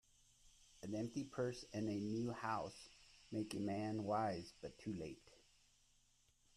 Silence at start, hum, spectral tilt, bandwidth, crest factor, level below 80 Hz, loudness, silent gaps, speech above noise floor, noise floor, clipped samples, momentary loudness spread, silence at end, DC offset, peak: 0.45 s; none; -6 dB/octave; 13.5 kHz; 18 dB; -72 dBFS; -45 LUFS; none; 31 dB; -76 dBFS; under 0.1%; 14 LU; 1.2 s; under 0.1%; -28 dBFS